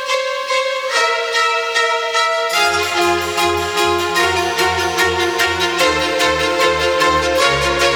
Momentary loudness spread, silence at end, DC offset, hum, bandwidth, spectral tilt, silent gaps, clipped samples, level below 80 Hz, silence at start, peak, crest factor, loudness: 2 LU; 0 s; under 0.1%; none; over 20 kHz; -2.5 dB/octave; none; under 0.1%; -40 dBFS; 0 s; 0 dBFS; 16 dB; -15 LUFS